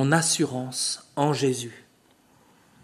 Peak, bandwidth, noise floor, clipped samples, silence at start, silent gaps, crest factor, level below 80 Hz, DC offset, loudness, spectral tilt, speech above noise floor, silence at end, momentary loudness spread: -6 dBFS; 13.5 kHz; -60 dBFS; under 0.1%; 0 s; none; 22 dB; -68 dBFS; under 0.1%; -25 LUFS; -4 dB/octave; 35 dB; 1.05 s; 8 LU